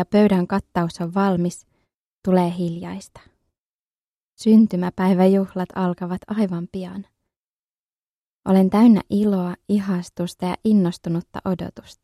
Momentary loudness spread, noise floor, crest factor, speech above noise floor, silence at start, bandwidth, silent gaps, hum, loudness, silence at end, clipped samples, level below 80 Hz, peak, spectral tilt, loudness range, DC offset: 15 LU; under -90 dBFS; 18 dB; over 70 dB; 0 s; 13 kHz; 1.94-2.20 s, 3.59-4.33 s, 7.36-8.43 s; none; -20 LUFS; 0.1 s; under 0.1%; -54 dBFS; -4 dBFS; -8 dB/octave; 5 LU; under 0.1%